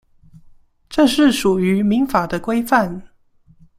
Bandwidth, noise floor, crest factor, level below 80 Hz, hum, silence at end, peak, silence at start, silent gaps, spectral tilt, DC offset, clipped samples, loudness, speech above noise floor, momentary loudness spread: 16 kHz; -53 dBFS; 16 dB; -46 dBFS; none; 0.75 s; -2 dBFS; 0.9 s; none; -5.5 dB/octave; under 0.1%; under 0.1%; -17 LUFS; 37 dB; 10 LU